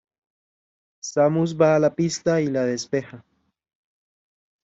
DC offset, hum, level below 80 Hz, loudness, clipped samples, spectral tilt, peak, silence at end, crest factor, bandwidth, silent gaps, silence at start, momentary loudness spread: under 0.1%; none; -64 dBFS; -22 LUFS; under 0.1%; -6 dB/octave; -6 dBFS; 1.45 s; 18 dB; 8 kHz; none; 1.05 s; 10 LU